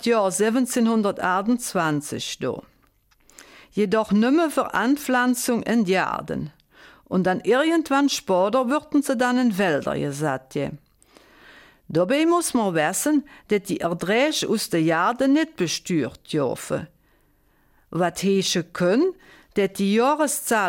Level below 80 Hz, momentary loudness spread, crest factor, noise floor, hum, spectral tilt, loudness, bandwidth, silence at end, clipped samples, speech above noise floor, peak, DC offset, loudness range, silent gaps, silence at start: -60 dBFS; 8 LU; 14 dB; -61 dBFS; none; -4.5 dB/octave; -22 LUFS; 17 kHz; 0 s; under 0.1%; 40 dB; -8 dBFS; under 0.1%; 4 LU; none; 0 s